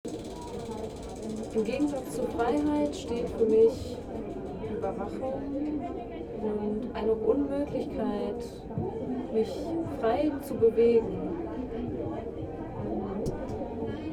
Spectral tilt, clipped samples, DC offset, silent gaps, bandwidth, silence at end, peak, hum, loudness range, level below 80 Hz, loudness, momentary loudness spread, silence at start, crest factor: -7 dB/octave; under 0.1%; under 0.1%; none; 13.5 kHz; 0 s; -12 dBFS; none; 3 LU; -48 dBFS; -31 LUFS; 12 LU; 0.05 s; 18 dB